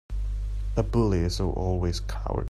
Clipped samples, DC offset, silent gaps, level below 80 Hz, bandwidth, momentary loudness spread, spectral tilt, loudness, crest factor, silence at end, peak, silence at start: under 0.1%; under 0.1%; none; -30 dBFS; 12.5 kHz; 9 LU; -7 dB/octave; -28 LUFS; 16 dB; 0.05 s; -10 dBFS; 0.1 s